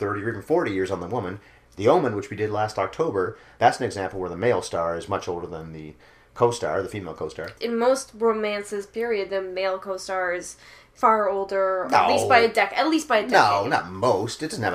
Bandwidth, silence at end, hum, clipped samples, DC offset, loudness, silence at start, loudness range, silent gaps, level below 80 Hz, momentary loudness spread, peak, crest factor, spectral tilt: 15.5 kHz; 0 s; none; under 0.1%; under 0.1%; -23 LUFS; 0 s; 7 LU; none; -58 dBFS; 13 LU; -4 dBFS; 20 dB; -4.5 dB/octave